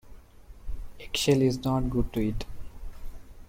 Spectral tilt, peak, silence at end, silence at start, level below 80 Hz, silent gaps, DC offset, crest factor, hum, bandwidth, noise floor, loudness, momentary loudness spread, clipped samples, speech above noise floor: -5.5 dB/octave; -12 dBFS; 0.05 s; 0.05 s; -38 dBFS; none; under 0.1%; 18 dB; none; 16.5 kHz; -48 dBFS; -27 LUFS; 24 LU; under 0.1%; 23 dB